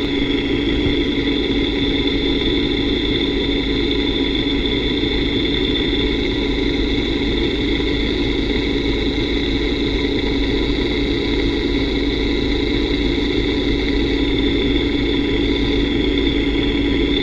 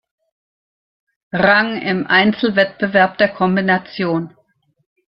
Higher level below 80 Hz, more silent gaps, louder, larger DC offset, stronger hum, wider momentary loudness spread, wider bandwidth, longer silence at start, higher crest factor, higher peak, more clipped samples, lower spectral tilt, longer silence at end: first, -26 dBFS vs -56 dBFS; neither; about the same, -18 LUFS vs -16 LUFS; neither; neither; second, 1 LU vs 8 LU; first, 7.8 kHz vs 5.8 kHz; second, 0 s vs 1.35 s; about the same, 14 dB vs 16 dB; about the same, -4 dBFS vs -2 dBFS; neither; second, -6 dB/octave vs -8.5 dB/octave; second, 0 s vs 0.85 s